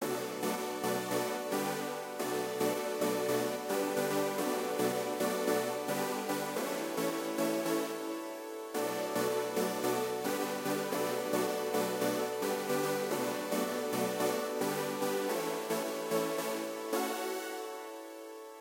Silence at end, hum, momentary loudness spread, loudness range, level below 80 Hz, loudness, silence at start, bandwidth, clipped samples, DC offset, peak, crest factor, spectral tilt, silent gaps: 0 s; none; 5 LU; 2 LU; -84 dBFS; -34 LUFS; 0 s; 16 kHz; under 0.1%; under 0.1%; -18 dBFS; 18 dB; -3.5 dB/octave; none